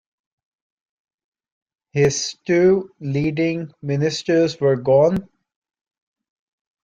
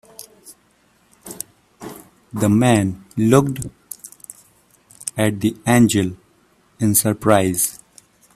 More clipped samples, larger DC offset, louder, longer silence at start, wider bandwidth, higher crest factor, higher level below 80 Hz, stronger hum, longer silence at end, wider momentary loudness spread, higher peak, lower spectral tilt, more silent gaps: neither; neither; about the same, -19 LUFS vs -18 LUFS; first, 1.95 s vs 0.45 s; second, 9.2 kHz vs 16 kHz; about the same, 16 dB vs 20 dB; about the same, -54 dBFS vs -52 dBFS; neither; first, 1.6 s vs 0.6 s; second, 10 LU vs 22 LU; second, -4 dBFS vs 0 dBFS; about the same, -5.5 dB/octave vs -5 dB/octave; neither